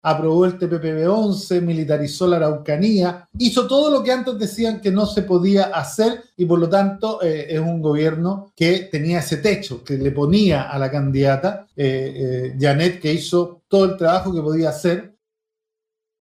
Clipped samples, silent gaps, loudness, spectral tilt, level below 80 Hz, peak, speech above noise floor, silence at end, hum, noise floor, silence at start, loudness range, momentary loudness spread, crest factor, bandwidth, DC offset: under 0.1%; none; -19 LUFS; -6.5 dB/octave; -48 dBFS; -4 dBFS; 65 dB; 1.15 s; none; -83 dBFS; 0.05 s; 2 LU; 6 LU; 16 dB; 15.5 kHz; under 0.1%